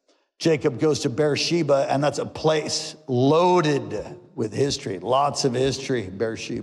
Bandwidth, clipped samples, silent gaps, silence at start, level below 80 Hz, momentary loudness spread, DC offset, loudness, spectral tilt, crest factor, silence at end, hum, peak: 12.5 kHz; under 0.1%; none; 0.4 s; -56 dBFS; 9 LU; under 0.1%; -23 LUFS; -5 dB/octave; 14 dB; 0 s; none; -10 dBFS